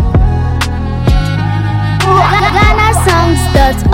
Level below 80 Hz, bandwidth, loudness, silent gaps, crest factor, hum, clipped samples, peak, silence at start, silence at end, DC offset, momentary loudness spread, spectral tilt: -16 dBFS; 16.5 kHz; -10 LUFS; none; 10 dB; none; 0.9%; 0 dBFS; 0 s; 0 s; under 0.1%; 6 LU; -5.5 dB/octave